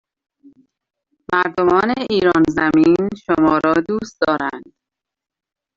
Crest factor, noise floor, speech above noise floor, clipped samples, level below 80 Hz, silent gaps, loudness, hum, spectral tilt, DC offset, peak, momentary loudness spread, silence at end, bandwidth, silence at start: 16 dB; -85 dBFS; 69 dB; under 0.1%; -50 dBFS; none; -16 LUFS; none; -6.5 dB/octave; under 0.1%; -2 dBFS; 7 LU; 1.15 s; 7.6 kHz; 1.3 s